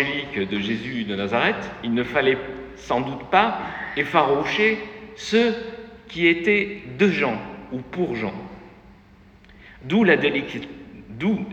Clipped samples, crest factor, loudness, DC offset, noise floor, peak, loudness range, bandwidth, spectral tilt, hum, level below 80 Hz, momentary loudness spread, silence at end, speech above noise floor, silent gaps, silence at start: under 0.1%; 22 dB; -22 LUFS; under 0.1%; -50 dBFS; -2 dBFS; 4 LU; 8.4 kHz; -6 dB/octave; none; -52 dBFS; 16 LU; 0 s; 28 dB; none; 0 s